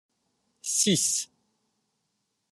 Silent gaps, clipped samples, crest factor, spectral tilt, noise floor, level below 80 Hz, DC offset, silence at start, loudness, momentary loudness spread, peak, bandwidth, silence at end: none; under 0.1%; 20 dB; -2.5 dB/octave; -78 dBFS; -74 dBFS; under 0.1%; 0.65 s; -24 LUFS; 16 LU; -10 dBFS; 13 kHz; 1.25 s